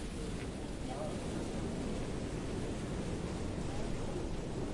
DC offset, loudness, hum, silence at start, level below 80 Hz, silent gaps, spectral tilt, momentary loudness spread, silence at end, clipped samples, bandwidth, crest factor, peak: under 0.1%; -40 LUFS; none; 0 s; -46 dBFS; none; -6 dB/octave; 2 LU; 0 s; under 0.1%; 11.5 kHz; 12 dB; -26 dBFS